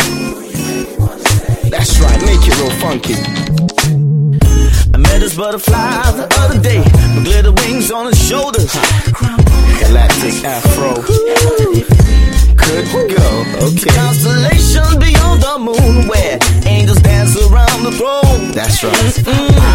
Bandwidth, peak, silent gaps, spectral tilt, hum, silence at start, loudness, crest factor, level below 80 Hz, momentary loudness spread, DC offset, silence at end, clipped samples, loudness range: 17 kHz; 0 dBFS; none; -5 dB/octave; none; 0 s; -11 LUFS; 8 dB; -12 dBFS; 5 LU; under 0.1%; 0 s; 0.3%; 2 LU